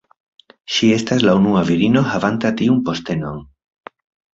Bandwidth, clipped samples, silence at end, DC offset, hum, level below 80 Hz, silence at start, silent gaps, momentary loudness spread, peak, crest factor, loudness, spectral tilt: 7.8 kHz; under 0.1%; 0.9 s; under 0.1%; none; -48 dBFS; 0.7 s; none; 10 LU; -2 dBFS; 16 dB; -16 LUFS; -6 dB/octave